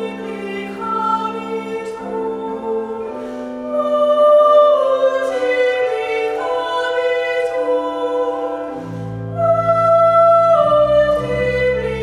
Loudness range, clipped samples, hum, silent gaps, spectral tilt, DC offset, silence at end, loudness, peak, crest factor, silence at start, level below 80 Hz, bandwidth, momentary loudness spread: 8 LU; under 0.1%; none; none; -6 dB/octave; under 0.1%; 0 s; -16 LUFS; -2 dBFS; 14 dB; 0 s; -44 dBFS; 11 kHz; 15 LU